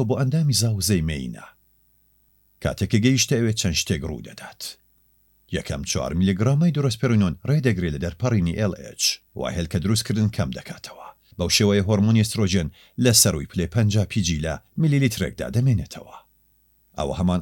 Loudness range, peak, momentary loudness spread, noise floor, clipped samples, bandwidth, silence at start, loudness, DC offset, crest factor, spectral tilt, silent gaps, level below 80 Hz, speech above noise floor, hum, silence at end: 5 LU; -2 dBFS; 16 LU; -62 dBFS; under 0.1%; 17 kHz; 0 s; -22 LUFS; under 0.1%; 20 dB; -5 dB/octave; none; -42 dBFS; 40 dB; 50 Hz at -45 dBFS; 0 s